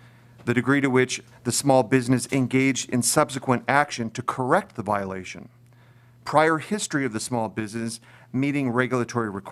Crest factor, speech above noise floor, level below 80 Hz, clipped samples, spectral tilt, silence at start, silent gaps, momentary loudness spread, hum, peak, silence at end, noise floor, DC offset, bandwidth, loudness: 22 dB; 29 dB; -64 dBFS; under 0.1%; -4.5 dB/octave; 0.4 s; none; 12 LU; none; -2 dBFS; 0 s; -53 dBFS; under 0.1%; 15.5 kHz; -24 LUFS